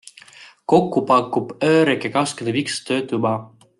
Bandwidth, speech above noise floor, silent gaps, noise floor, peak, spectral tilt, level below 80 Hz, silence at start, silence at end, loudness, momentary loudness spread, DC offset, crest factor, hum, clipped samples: 12 kHz; 27 dB; none; -46 dBFS; -4 dBFS; -5 dB/octave; -62 dBFS; 0.4 s; 0.3 s; -19 LUFS; 7 LU; under 0.1%; 16 dB; none; under 0.1%